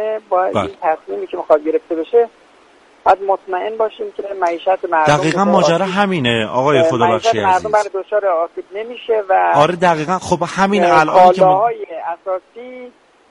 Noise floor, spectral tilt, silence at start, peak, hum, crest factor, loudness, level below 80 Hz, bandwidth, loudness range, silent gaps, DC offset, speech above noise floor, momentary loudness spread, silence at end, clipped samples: -48 dBFS; -5.5 dB/octave; 0 s; 0 dBFS; none; 16 dB; -15 LUFS; -52 dBFS; 11.5 kHz; 5 LU; none; under 0.1%; 33 dB; 13 LU; 0.4 s; under 0.1%